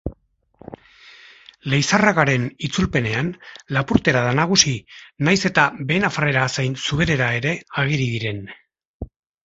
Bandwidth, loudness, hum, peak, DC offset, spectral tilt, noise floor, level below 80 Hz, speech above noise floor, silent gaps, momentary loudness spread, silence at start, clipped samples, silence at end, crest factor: 8 kHz; -19 LUFS; none; 0 dBFS; under 0.1%; -4.5 dB/octave; -55 dBFS; -44 dBFS; 36 dB; 8.85-9.00 s; 18 LU; 0.05 s; under 0.1%; 0.4 s; 22 dB